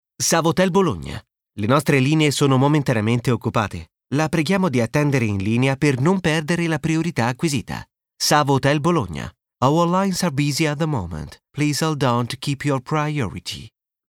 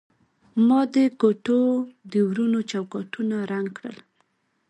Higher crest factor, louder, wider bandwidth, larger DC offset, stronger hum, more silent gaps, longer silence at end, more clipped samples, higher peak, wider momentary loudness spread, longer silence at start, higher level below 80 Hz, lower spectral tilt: about the same, 18 dB vs 18 dB; first, -20 LUFS vs -23 LUFS; first, 17.5 kHz vs 9.2 kHz; neither; neither; neither; second, 0.4 s vs 0.75 s; neither; first, -2 dBFS vs -6 dBFS; about the same, 13 LU vs 12 LU; second, 0.2 s vs 0.55 s; first, -48 dBFS vs -72 dBFS; second, -5.5 dB/octave vs -7 dB/octave